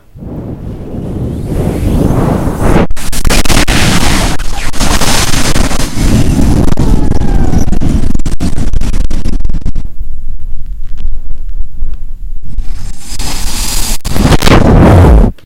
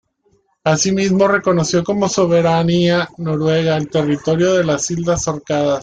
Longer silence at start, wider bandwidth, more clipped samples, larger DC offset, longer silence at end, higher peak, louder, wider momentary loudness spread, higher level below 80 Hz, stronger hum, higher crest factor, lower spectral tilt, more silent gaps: second, 0.15 s vs 0.65 s; first, 15.5 kHz vs 9.4 kHz; first, 4% vs under 0.1%; neither; about the same, 0.1 s vs 0 s; about the same, 0 dBFS vs -2 dBFS; first, -11 LUFS vs -16 LUFS; first, 19 LU vs 5 LU; first, -12 dBFS vs -48 dBFS; neither; second, 6 dB vs 14 dB; about the same, -5 dB/octave vs -5 dB/octave; neither